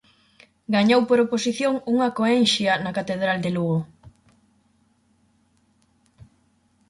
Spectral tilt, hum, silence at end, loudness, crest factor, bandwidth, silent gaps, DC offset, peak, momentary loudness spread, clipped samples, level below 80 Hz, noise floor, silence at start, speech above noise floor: -5 dB/octave; none; 2.8 s; -21 LUFS; 18 dB; 11.5 kHz; none; under 0.1%; -6 dBFS; 8 LU; under 0.1%; -62 dBFS; -64 dBFS; 0.7 s; 43 dB